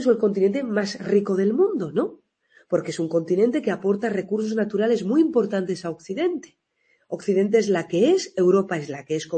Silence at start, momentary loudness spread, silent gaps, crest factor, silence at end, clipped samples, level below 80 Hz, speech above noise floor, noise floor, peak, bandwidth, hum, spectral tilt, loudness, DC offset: 0 s; 9 LU; none; 16 dB; 0 s; under 0.1%; -70 dBFS; 45 dB; -67 dBFS; -6 dBFS; 8.8 kHz; none; -6.5 dB/octave; -23 LUFS; under 0.1%